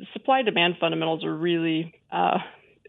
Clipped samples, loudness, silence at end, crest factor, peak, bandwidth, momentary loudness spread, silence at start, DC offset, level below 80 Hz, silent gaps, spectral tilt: under 0.1%; -24 LUFS; 0.35 s; 18 dB; -6 dBFS; 4.1 kHz; 8 LU; 0 s; under 0.1%; -76 dBFS; none; -8.5 dB/octave